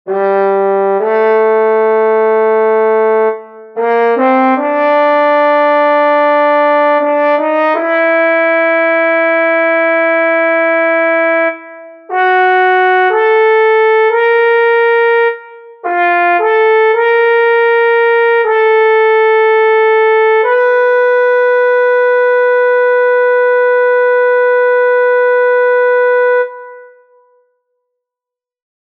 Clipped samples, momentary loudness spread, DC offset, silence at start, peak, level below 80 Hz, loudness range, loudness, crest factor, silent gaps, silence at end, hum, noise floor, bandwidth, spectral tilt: under 0.1%; 3 LU; under 0.1%; 0.05 s; 0 dBFS; -76 dBFS; 2 LU; -10 LUFS; 10 dB; none; 1.95 s; none; -86 dBFS; 5.2 kHz; -6 dB/octave